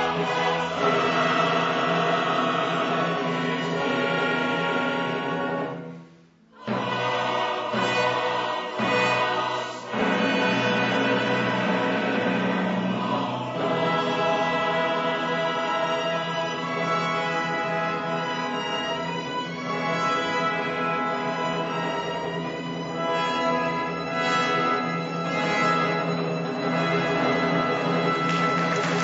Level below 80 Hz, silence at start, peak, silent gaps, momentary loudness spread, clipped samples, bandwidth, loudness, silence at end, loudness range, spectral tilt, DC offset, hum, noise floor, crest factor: -64 dBFS; 0 s; -10 dBFS; none; 6 LU; under 0.1%; 8 kHz; -24 LUFS; 0 s; 3 LU; -5 dB/octave; under 0.1%; none; -53 dBFS; 16 dB